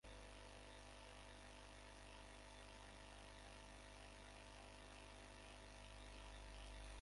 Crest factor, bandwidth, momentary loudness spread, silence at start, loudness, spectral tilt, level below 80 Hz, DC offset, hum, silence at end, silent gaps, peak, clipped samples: 16 dB; 11.5 kHz; 2 LU; 0.05 s; -60 LUFS; -3.5 dB/octave; -64 dBFS; under 0.1%; 50 Hz at -65 dBFS; 0 s; none; -44 dBFS; under 0.1%